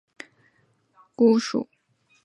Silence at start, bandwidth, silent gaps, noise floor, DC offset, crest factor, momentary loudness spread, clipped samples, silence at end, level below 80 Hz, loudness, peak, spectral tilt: 1.2 s; 9 kHz; none; -66 dBFS; under 0.1%; 20 dB; 25 LU; under 0.1%; 0.6 s; -76 dBFS; -22 LUFS; -8 dBFS; -5.5 dB/octave